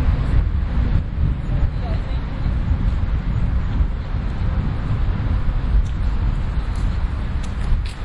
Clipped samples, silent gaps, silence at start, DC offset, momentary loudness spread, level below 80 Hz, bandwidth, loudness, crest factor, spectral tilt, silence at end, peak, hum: under 0.1%; none; 0 s; under 0.1%; 4 LU; -20 dBFS; 7.8 kHz; -23 LUFS; 14 dB; -8 dB/octave; 0 s; -4 dBFS; none